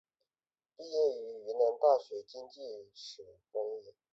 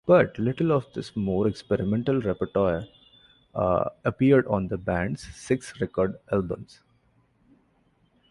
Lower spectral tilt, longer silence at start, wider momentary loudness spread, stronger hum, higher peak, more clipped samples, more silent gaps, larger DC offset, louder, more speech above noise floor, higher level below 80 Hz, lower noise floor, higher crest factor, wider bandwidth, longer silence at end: second, -3.5 dB/octave vs -7.5 dB/octave; first, 0.8 s vs 0.05 s; first, 19 LU vs 12 LU; neither; second, -16 dBFS vs -6 dBFS; neither; neither; neither; second, -33 LUFS vs -26 LUFS; first, over 56 dB vs 41 dB; second, -86 dBFS vs -50 dBFS; first, under -90 dBFS vs -65 dBFS; about the same, 20 dB vs 20 dB; second, 7.8 kHz vs 11.5 kHz; second, 0.25 s vs 1.65 s